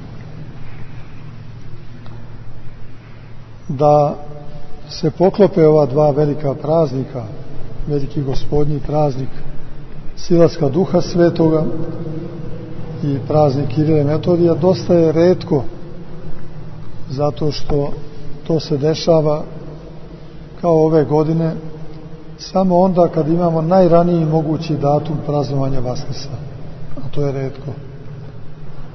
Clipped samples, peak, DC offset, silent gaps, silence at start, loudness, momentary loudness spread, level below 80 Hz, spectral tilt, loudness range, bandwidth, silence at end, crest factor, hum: under 0.1%; 0 dBFS; under 0.1%; none; 0 s; -16 LUFS; 23 LU; -32 dBFS; -8.5 dB/octave; 7 LU; 6.2 kHz; 0 s; 16 dB; none